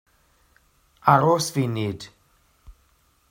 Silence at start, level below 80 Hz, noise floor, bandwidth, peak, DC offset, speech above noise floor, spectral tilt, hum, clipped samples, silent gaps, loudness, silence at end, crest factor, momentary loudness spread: 1.05 s; -56 dBFS; -63 dBFS; 16.5 kHz; 0 dBFS; under 0.1%; 42 dB; -5.5 dB/octave; none; under 0.1%; none; -21 LUFS; 0.6 s; 24 dB; 18 LU